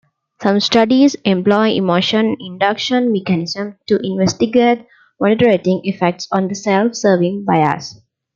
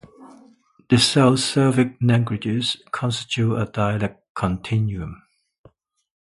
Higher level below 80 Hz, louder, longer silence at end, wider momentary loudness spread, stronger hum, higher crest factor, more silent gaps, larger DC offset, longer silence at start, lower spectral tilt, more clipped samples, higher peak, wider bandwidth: second, -58 dBFS vs -48 dBFS; first, -15 LUFS vs -21 LUFS; second, 0.45 s vs 1.05 s; second, 7 LU vs 10 LU; neither; second, 14 dB vs 20 dB; second, none vs 4.29-4.35 s; neither; first, 0.4 s vs 0.2 s; about the same, -5.5 dB/octave vs -5.5 dB/octave; neither; about the same, 0 dBFS vs -2 dBFS; second, 7.4 kHz vs 11.5 kHz